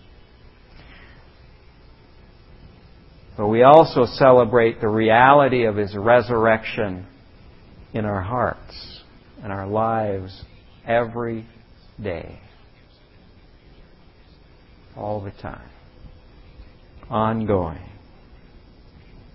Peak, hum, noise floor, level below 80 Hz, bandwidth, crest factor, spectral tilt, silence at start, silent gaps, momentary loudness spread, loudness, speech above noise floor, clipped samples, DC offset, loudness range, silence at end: 0 dBFS; none; -51 dBFS; -46 dBFS; 5.8 kHz; 22 dB; -9 dB/octave; 3.4 s; none; 24 LU; -19 LUFS; 32 dB; under 0.1%; under 0.1%; 22 LU; 1.45 s